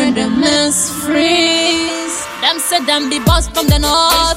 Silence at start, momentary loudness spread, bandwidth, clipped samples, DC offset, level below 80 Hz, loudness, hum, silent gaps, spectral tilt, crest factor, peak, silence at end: 0 s; 5 LU; 16.5 kHz; under 0.1%; under 0.1%; -26 dBFS; -13 LUFS; none; none; -3 dB/octave; 14 dB; 0 dBFS; 0 s